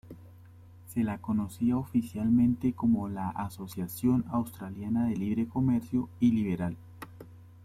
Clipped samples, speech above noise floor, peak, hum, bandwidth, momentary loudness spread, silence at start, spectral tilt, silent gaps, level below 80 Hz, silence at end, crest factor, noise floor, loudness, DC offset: under 0.1%; 23 dB; -14 dBFS; none; 15.5 kHz; 12 LU; 0.05 s; -8 dB/octave; none; -58 dBFS; 0.05 s; 16 dB; -52 dBFS; -30 LUFS; under 0.1%